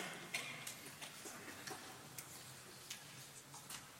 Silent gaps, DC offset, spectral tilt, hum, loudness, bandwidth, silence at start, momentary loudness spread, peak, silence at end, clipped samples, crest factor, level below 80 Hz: none; under 0.1%; -1.5 dB/octave; none; -50 LUFS; 16.5 kHz; 0 s; 9 LU; -26 dBFS; 0 s; under 0.1%; 26 dB; -84 dBFS